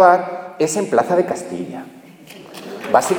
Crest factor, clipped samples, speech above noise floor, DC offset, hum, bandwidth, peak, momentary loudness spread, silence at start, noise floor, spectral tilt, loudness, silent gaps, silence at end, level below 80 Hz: 18 dB; under 0.1%; 24 dB; under 0.1%; none; 19.5 kHz; 0 dBFS; 21 LU; 0 s; -40 dBFS; -4.5 dB/octave; -19 LUFS; none; 0 s; -64 dBFS